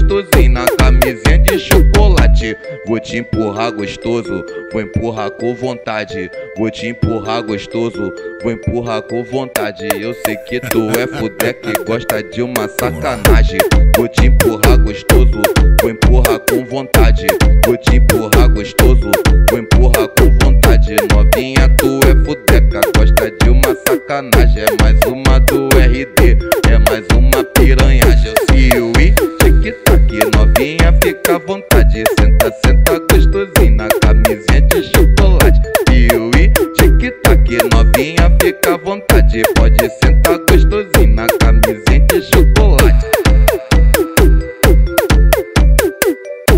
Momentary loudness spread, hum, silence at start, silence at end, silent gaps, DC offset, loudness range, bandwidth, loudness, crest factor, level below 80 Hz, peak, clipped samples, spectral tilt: 9 LU; none; 0 s; 0 s; none; 0.4%; 8 LU; 16.5 kHz; -12 LUFS; 10 dB; -12 dBFS; 0 dBFS; 0.3%; -5.5 dB/octave